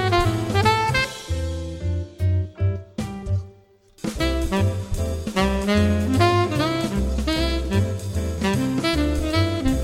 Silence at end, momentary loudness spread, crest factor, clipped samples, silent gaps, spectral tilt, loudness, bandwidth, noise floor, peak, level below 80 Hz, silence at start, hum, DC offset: 0 s; 9 LU; 20 dB; under 0.1%; none; -6 dB/octave; -23 LUFS; 15.5 kHz; -52 dBFS; -2 dBFS; -30 dBFS; 0 s; none; under 0.1%